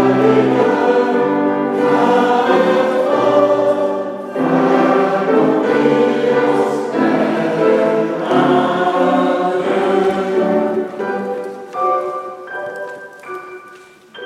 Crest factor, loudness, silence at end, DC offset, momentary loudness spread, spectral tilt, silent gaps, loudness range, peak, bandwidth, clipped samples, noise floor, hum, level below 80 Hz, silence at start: 14 dB; -15 LUFS; 0 s; under 0.1%; 13 LU; -6.5 dB/octave; none; 6 LU; 0 dBFS; 12.5 kHz; under 0.1%; -41 dBFS; none; -64 dBFS; 0 s